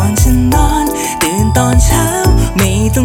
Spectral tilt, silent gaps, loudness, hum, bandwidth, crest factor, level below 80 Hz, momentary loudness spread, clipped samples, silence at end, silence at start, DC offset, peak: -5 dB/octave; none; -11 LUFS; none; 18 kHz; 10 dB; -16 dBFS; 4 LU; under 0.1%; 0 s; 0 s; under 0.1%; 0 dBFS